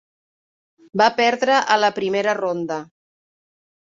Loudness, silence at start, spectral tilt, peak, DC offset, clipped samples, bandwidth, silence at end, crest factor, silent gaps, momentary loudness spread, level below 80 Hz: -19 LUFS; 0.95 s; -3.5 dB/octave; -2 dBFS; under 0.1%; under 0.1%; 7.6 kHz; 1.1 s; 20 dB; none; 12 LU; -70 dBFS